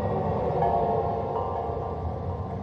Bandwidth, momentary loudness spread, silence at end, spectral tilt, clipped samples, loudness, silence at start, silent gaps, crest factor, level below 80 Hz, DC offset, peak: 6.4 kHz; 8 LU; 0 s; -10 dB/octave; under 0.1%; -28 LUFS; 0 s; none; 16 dB; -42 dBFS; under 0.1%; -12 dBFS